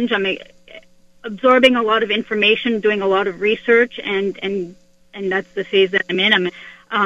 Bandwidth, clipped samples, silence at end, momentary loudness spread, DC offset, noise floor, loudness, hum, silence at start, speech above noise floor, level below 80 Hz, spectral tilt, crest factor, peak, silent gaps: 9.2 kHz; under 0.1%; 0 s; 13 LU; under 0.1%; -44 dBFS; -17 LUFS; none; 0 s; 27 dB; -58 dBFS; -5 dB/octave; 18 dB; 0 dBFS; none